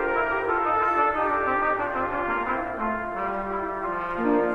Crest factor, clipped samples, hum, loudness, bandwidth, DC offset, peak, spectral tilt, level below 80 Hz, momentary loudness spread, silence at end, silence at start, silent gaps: 14 dB; under 0.1%; none; -25 LUFS; 11.5 kHz; under 0.1%; -10 dBFS; -7 dB/octave; -48 dBFS; 6 LU; 0 s; 0 s; none